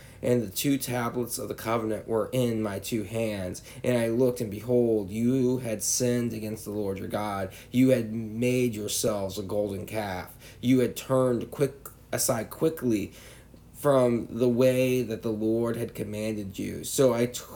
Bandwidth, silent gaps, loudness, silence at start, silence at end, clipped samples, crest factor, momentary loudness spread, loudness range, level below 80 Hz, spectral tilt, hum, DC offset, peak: 19.5 kHz; none; -27 LUFS; 0 s; 0 s; under 0.1%; 16 dB; 10 LU; 2 LU; -56 dBFS; -5.5 dB/octave; none; under 0.1%; -10 dBFS